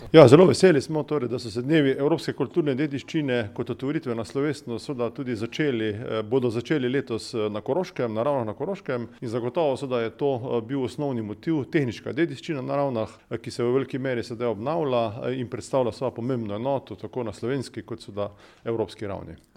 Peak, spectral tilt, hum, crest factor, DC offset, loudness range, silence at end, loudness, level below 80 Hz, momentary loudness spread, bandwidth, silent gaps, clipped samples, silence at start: 0 dBFS; -6.5 dB/octave; none; 24 dB; under 0.1%; 3 LU; 0.2 s; -25 LUFS; -60 dBFS; 9 LU; 13 kHz; none; under 0.1%; 0 s